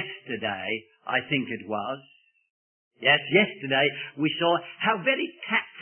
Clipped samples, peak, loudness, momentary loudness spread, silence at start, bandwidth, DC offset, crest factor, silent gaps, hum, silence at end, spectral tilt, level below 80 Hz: under 0.1%; -6 dBFS; -26 LUFS; 10 LU; 0 s; 3.4 kHz; under 0.1%; 22 dB; 2.50-2.91 s; none; 0 s; -9 dB/octave; -72 dBFS